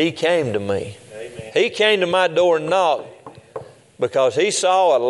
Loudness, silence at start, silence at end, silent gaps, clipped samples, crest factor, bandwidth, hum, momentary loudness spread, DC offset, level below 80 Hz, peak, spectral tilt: -18 LUFS; 0 s; 0 s; none; under 0.1%; 16 dB; 11.5 kHz; none; 20 LU; under 0.1%; -64 dBFS; -2 dBFS; -3.5 dB/octave